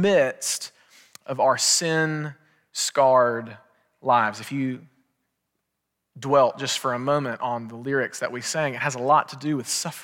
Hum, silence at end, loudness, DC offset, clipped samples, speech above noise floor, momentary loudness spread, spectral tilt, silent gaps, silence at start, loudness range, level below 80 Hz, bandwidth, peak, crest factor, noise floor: none; 0 s; -23 LUFS; under 0.1%; under 0.1%; 57 dB; 13 LU; -3 dB/octave; none; 0 s; 4 LU; -76 dBFS; 17 kHz; -6 dBFS; 18 dB; -80 dBFS